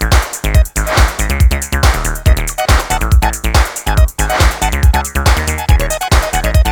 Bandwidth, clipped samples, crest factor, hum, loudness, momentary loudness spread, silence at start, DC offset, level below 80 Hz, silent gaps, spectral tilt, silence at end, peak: over 20 kHz; under 0.1%; 12 dB; none; -13 LUFS; 1 LU; 0 s; under 0.1%; -14 dBFS; none; -4 dB/octave; 0 s; 0 dBFS